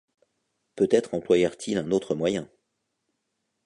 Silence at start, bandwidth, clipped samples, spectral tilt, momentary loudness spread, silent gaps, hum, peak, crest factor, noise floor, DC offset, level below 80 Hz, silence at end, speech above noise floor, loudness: 0.75 s; 11 kHz; under 0.1%; -5.5 dB/octave; 6 LU; none; none; -6 dBFS; 20 dB; -79 dBFS; under 0.1%; -62 dBFS; 1.2 s; 54 dB; -25 LUFS